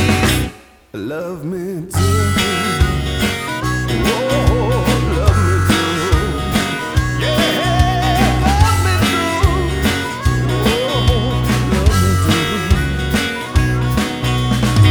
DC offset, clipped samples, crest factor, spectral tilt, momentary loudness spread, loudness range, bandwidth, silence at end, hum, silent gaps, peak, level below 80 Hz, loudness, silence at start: under 0.1%; under 0.1%; 14 dB; -5 dB/octave; 5 LU; 3 LU; over 20 kHz; 0 s; none; none; 0 dBFS; -22 dBFS; -16 LUFS; 0 s